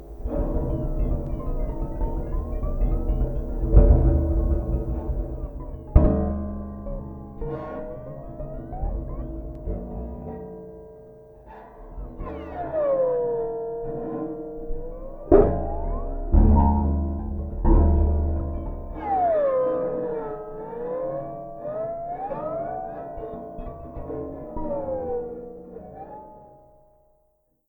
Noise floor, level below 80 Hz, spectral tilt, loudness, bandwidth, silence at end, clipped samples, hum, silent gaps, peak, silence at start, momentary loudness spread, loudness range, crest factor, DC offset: -67 dBFS; -26 dBFS; -12 dB/octave; -26 LUFS; 2.8 kHz; 1.2 s; under 0.1%; none; none; -2 dBFS; 0 s; 18 LU; 12 LU; 22 dB; under 0.1%